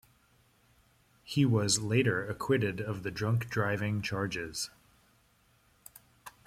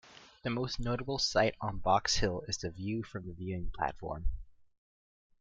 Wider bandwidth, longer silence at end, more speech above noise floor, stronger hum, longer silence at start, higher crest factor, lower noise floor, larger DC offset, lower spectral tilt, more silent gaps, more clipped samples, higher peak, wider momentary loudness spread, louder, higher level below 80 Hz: first, 16 kHz vs 9.2 kHz; second, 0.15 s vs 0.75 s; second, 37 dB vs over 57 dB; neither; first, 1.25 s vs 0.05 s; about the same, 20 dB vs 20 dB; second, -67 dBFS vs under -90 dBFS; neither; about the same, -5 dB/octave vs -4 dB/octave; neither; neither; about the same, -14 dBFS vs -14 dBFS; about the same, 13 LU vs 13 LU; first, -31 LUFS vs -34 LUFS; second, -64 dBFS vs -44 dBFS